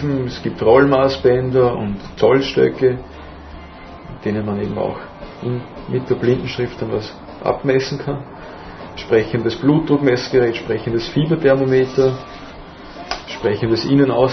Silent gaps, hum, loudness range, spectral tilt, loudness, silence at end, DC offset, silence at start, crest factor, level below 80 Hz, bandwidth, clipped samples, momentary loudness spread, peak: none; none; 7 LU; -7 dB/octave; -18 LUFS; 0 s; under 0.1%; 0 s; 18 dB; -42 dBFS; 6.4 kHz; under 0.1%; 20 LU; 0 dBFS